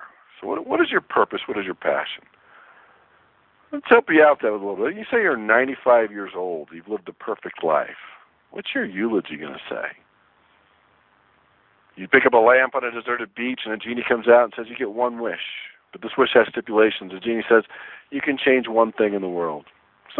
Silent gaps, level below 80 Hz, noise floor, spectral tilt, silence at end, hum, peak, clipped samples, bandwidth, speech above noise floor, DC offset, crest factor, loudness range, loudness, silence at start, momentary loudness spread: none; -68 dBFS; -60 dBFS; -8.5 dB/octave; 0 s; none; 0 dBFS; under 0.1%; 4.2 kHz; 39 dB; under 0.1%; 22 dB; 8 LU; -21 LUFS; 0 s; 17 LU